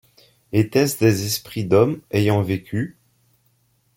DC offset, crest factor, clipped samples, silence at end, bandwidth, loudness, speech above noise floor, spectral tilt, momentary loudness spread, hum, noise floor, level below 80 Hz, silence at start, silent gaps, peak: under 0.1%; 18 dB; under 0.1%; 1.05 s; 17 kHz; -20 LUFS; 44 dB; -6 dB/octave; 8 LU; none; -63 dBFS; -56 dBFS; 0.55 s; none; -4 dBFS